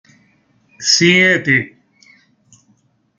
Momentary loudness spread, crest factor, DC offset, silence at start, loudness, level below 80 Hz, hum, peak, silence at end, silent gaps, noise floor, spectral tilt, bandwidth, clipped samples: 11 LU; 18 dB; under 0.1%; 0.8 s; -12 LUFS; -60 dBFS; none; 0 dBFS; 1.5 s; none; -58 dBFS; -3 dB/octave; 10 kHz; under 0.1%